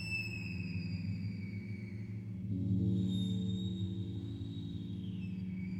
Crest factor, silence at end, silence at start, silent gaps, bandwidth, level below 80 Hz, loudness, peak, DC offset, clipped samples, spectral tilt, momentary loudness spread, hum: 14 dB; 0 s; 0 s; none; 11.5 kHz; -60 dBFS; -39 LUFS; -24 dBFS; under 0.1%; under 0.1%; -7.5 dB/octave; 9 LU; none